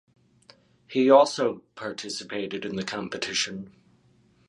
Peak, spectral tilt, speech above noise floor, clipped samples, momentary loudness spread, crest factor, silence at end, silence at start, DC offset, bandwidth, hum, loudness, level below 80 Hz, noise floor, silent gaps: -4 dBFS; -3.5 dB/octave; 37 dB; under 0.1%; 18 LU; 22 dB; 0.8 s; 0.9 s; under 0.1%; 11.5 kHz; none; -25 LUFS; -68 dBFS; -62 dBFS; none